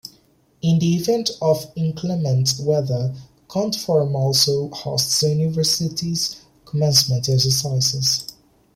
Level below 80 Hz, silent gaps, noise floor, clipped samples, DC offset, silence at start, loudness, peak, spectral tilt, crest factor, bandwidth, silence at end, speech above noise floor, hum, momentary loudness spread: -54 dBFS; none; -57 dBFS; under 0.1%; under 0.1%; 0.05 s; -19 LUFS; -2 dBFS; -4.5 dB/octave; 20 dB; 16.5 kHz; 0.45 s; 37 dB; none; 9 LU